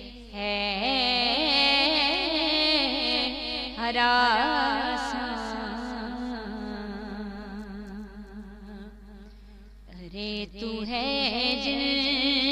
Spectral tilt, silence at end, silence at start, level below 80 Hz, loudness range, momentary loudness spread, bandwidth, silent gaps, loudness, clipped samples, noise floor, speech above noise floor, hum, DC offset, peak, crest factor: -3.5 dB/octave; 0 s; 0 s; -48 dBFS; 17 LU; 20 LU; 11.5 kHz; none; -25 LUFS; under 0.1%; -48 dBFS; 24 dB; 50 Hz at -50 dBFS; under 0.1%; -8 dBFS; 20 dB